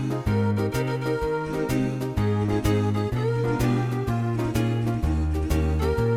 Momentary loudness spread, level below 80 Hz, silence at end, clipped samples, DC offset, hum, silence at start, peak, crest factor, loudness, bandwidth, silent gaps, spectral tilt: 3 LU; -32 dBFS; 0 s; under 0.1%; under 0.1%; none; 0 s; -10 dBFS; 14 dB; -25 LUFS; 16.5 kHz; none; -7.5 dB/octave